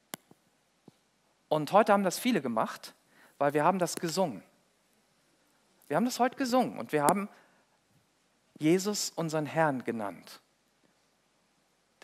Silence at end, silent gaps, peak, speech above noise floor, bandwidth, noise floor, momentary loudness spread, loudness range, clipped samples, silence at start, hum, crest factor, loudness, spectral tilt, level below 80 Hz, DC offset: 1.65 s; none; -8 dBFS; 43 dB; 16 kHz; -71 dBFS; 17 LU; 4 LU; under 0.1%; 1.5 s; none; 24 dB; -29 LUFS; -4.5 dB/octave; -86 dBFS; under 0.1%